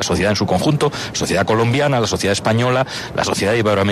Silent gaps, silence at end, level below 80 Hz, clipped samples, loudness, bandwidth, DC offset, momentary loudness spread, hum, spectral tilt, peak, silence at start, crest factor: none; 0 s; -42 dBFS; under 0.1%; -17 LUFS; 13.5 kHz; under 0.1%; 4 LU; none; -5 dB/octave; -4 dBFS; 0 s; 12 dB